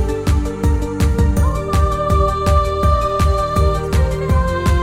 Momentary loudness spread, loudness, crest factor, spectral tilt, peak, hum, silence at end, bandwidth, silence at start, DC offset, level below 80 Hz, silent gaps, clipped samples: 3 LU; -17 LUFS; 12 dB; -7 dB/octave; -4 dBFS; none; 0 s; 15.5 kHz; 0 s; 0.4%; -18 dBFS; none; under 0.1%